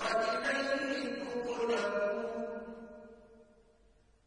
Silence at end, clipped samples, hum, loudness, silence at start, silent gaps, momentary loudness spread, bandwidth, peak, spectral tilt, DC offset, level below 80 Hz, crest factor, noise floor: 0.85 s; under 0.1%; none; -35 LUFS; 0 s; none; 18 LU; 10.5 kHz; -18 dBFS; -3.5 dB/octave; under 0.1%; -68 dBFS; 18 dB; -66 dBFS